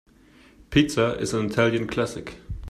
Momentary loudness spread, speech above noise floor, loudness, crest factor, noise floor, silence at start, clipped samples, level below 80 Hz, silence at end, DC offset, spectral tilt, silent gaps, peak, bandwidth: 16 LU; 30 dB; -24 LUFS; 20 dB; -54 dBFS; 0.7 s; under 0.1%; -44 dBFS; 0 s; under 0.1%; -5.5 dB/octave; none; -6 dBFS; 14 kHz